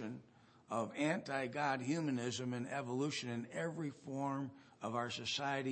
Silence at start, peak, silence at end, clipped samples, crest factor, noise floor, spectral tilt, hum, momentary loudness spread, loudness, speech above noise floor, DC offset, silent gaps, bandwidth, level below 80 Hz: 0 s; -22 dBFS; 0 s; under 0.1%; 18 dB; -65 dBFS; -5 dB/octave; none; 7 LU; -40 LUFS; 25 dB; under 0.1%; none; 8.4 kHz; -84 dBFS